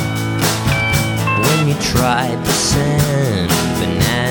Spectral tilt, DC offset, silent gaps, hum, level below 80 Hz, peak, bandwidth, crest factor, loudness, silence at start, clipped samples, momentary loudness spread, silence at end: -4.5 dB/octave; under 0.1%; none; none; -32 dBFS; -2 dBFS; 18 kHz; 14 dB; -15 LUFS; 0 s; under 0.1%; 2 LU; 0 s